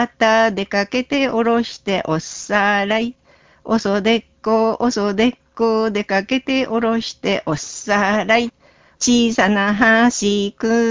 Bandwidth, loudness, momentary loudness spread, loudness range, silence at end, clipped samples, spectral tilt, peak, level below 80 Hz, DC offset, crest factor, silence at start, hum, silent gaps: 7.6 kHz; -17 LUFS; 7 LU; 3 LU; 0 s; under 0.1%; -4 dB/octave; -2 dBFS; -50 dBFS; under 0.1%; 16 dB; 0 s; none; none